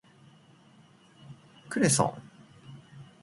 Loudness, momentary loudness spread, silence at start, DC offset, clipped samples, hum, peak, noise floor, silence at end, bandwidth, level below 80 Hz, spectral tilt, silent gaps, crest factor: -27 LUFS; 27 LU; 1.3 s; under 0.1%; under 0.1%; none; -8 dBFS; -58 dBFS; 0.2 s; 12 kHz; -66 dBFS; -4 dB/octave; none; 24 dB